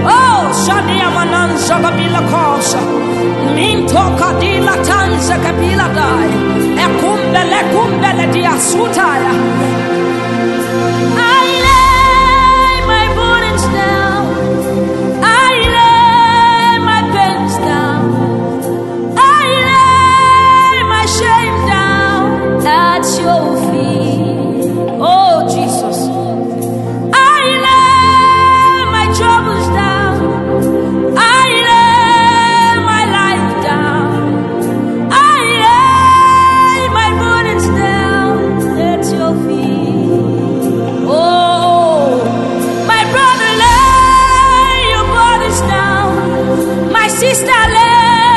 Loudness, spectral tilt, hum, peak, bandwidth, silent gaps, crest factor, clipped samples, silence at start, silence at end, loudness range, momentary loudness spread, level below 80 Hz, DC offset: -10 LUFS; -4.5 dB/octave; none; 0 dBFS; 12.5 kHz; none; 10 dB; under 0.1%; 0 s; 0 s; 4 LU; 8 LU; -28 dBFS; under 0.1%